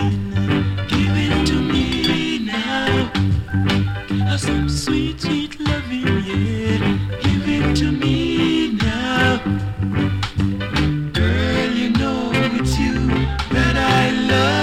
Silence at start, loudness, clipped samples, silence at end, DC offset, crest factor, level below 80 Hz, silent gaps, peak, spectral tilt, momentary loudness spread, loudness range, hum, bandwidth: 0 s; -19 LUFS; under 0.1%; 0 s; under 0.1%; 16 dB; -30 dBFS; none; -2 dBFS; -6 dB/octave; 5 LU; 2 LU; none; 13.5 kHz